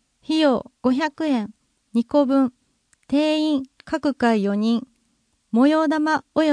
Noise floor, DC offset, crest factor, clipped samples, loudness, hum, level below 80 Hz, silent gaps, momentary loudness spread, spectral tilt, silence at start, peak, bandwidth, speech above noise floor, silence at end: -67 dBFS; under 0.1%; 16 dB; under 0.1%; -21 LUFS; none; -62 dBFS; none; 7 LU; -6 dB/octave; 0.3 s; -6 dBFS; 10.5 kHz; 47 dB; 0 s